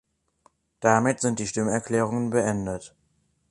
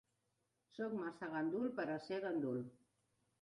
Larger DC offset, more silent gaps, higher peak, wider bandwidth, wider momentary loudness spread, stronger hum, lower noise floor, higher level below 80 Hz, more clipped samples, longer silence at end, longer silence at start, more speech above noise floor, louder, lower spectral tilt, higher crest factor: neither; neither; first, -4 dBFS vs -30 dBFS; about the same, 11.5 kHz vs 11 kHz; about the same, 8 LU vs 7 LU; neither; second, -69 dBFS vs -85 dBFS; first, -56 dBFS vs -84 dBFS; neither; about the same, 0.65 s vs 0.7 s; about the same, 0.8 s vs 0.75 s; about the same, 45 dB vs 43 dB; first, -25 LUFS vs -43 LUFS; second, -5.5 dB/octave vs -7.5 dB/octave; first, 22 dB vs 14 dB